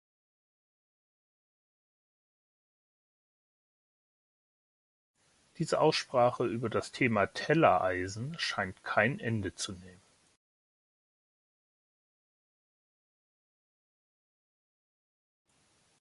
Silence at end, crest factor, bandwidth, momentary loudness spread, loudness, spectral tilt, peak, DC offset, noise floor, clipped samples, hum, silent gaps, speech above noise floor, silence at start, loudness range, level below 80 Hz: 6.1 s; 26 dB; 11.5 kHz; 12 LU; -30 LUFS; -5 dB/octave; -10 dBFS; under 0.1%; -71 dBFS; under 0.1%; none; none; 40 dB; 5.6 s; 13 LU; -64 dBFS